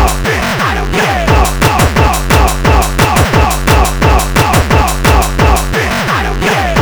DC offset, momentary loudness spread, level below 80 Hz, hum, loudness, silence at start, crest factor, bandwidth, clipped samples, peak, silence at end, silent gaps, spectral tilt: under 0.1%; 3 LU; -14 dBFS; none; -10 LUFS; 0 s; 10 dB; over 20 kHz; 0.3%; 0 dBFS; 0 s; none; -4.5 dB/octave